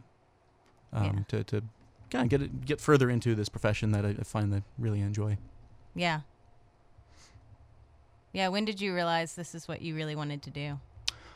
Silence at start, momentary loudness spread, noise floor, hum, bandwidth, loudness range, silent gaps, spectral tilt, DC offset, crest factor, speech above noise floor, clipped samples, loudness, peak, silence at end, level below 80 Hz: 0.9 s; 11 LU; -65 dBFS; none; 13.5 kHz; 7 LU; none; -6 dB/octave; under 0.1%; 26 dB; 35 dB; under 0.1%; -32 LUFS; -6 dBFS; 0 s; -54 dBFS